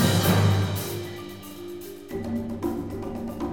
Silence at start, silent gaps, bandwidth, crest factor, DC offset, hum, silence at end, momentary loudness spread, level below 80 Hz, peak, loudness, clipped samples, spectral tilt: 0 s; none; over 20 kHz; 18 dB; 0.2%; none; 0 s; 18 LU; -48 dBFS; -8 dBFS; -27 LUFS; under 0.1%; -5.5 dB/octave